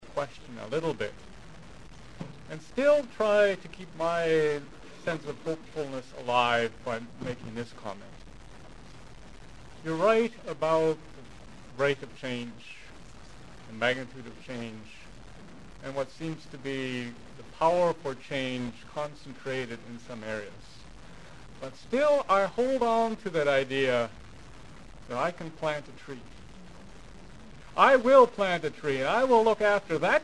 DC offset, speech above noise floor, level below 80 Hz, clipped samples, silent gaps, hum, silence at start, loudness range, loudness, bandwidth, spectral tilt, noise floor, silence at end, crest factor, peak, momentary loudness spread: 0.4%; 21 dB; -56 dBFS; under 0.1%; none; none; 0 s; 11 LU; -28 LUFS; 11.5 kHz; -5 dB/octave; -49 dBFS; 0 s; 24 dB; -6 dBFS; 25 LU